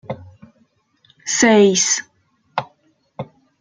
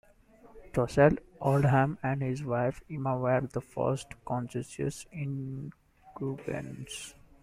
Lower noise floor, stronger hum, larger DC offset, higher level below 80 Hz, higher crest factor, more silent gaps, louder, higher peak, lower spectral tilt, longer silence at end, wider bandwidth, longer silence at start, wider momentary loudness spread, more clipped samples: about the same, -61 dBFS vs -58 dBFS; neither; neither; second, -62 dBFS vs -54 dBFS; about the same, 18 dB vs 22 dB; neither; first, -16 LUFS vs -31 LUFS; first, -2 dBFS vs -10 dBFS; second, -3 dB/octave vs -7 dB/octave; about the same, 0.35 s vs 0.3 s; second, 10 kHz vs 14 kHz; second, 0.1 s vs 0.45 s; first, 23 LU vs 15 LU; neither